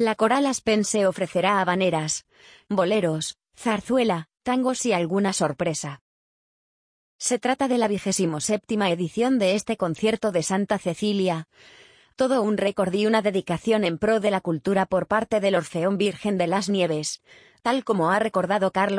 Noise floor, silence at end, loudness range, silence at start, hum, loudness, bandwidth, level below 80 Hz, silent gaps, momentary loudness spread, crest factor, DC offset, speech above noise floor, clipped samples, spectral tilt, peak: under -90 dBFS; 0 s; 3 LU; 0 s; none; -23 LUFS; 10.5 kHz; -60 dBFS; 6.01-7.19 s; 6 LU; 18 dB; under 0.1%; over 67 dB; under 0.1%; -4.5 dB/octave; -6 dBFS